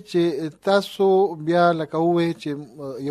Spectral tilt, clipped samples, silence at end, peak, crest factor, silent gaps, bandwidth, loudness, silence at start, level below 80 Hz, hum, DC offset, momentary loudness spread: -7 dB/octave; under 0.1%; 0 s; -4 dBFS; 16 dB; none; 14 kHz; -21 LUFS; 0.1 s; -66 dBFS; none; under 0.1%; 12 LU